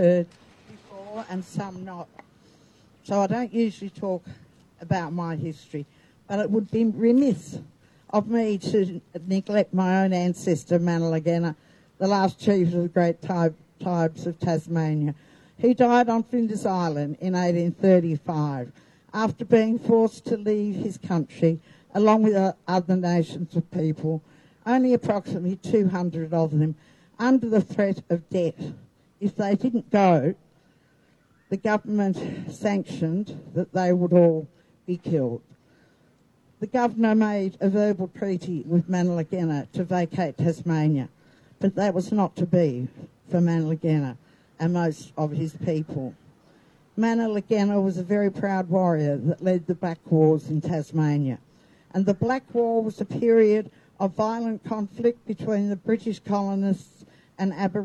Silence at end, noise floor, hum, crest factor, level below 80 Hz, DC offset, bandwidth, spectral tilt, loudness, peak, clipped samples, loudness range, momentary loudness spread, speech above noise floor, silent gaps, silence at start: 0 s; -61 dBFS; none; 20 dB; -66 dBFS; under 0.1%; 11 kHz; -8 dB/octave; -24 LUFS; -4 dBFS; under 0.1%; 5 LU; 12 LU; 38 dB; none; 0 s